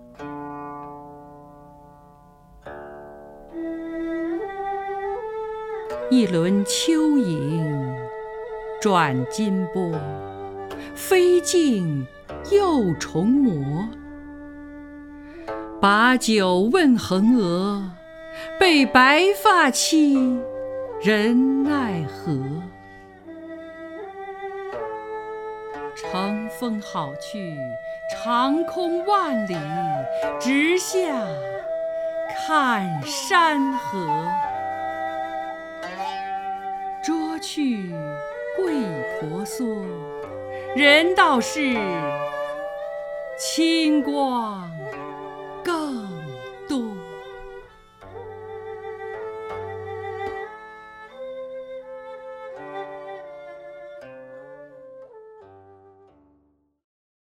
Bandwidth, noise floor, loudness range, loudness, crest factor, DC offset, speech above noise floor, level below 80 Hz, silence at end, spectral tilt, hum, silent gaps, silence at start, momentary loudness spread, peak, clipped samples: 16 kHz; -64 dBFS; 17 LU; -22 LUFS; 22 dB; under 0.1%; 44 dB; -54 dBFS; 1.5 s; -4.5 dB/octave; none; none; 0 s; 21 LU; -2 dBFS; under 0.1%